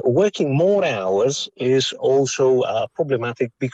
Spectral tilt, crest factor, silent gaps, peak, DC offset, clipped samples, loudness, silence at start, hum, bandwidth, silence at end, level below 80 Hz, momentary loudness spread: -5 dB/octave; 12 dB; none; -6 dBFS; under 0.1%; under 0.1%; -19 LUFS; 0.05 s; none; 8.4 kHz; 0.05 s; -66 dBFS; 6 LU